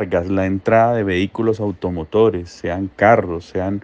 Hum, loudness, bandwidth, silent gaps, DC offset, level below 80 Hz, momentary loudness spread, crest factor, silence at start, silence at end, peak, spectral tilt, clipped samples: none; -18 LUFS; 8.2 kHz; none; under 0.1%; -50 dBFS; 10 LU; 18 dB; 0 s; 0 s; 0 dBFS; -7.5 dB/octave; under 0.1%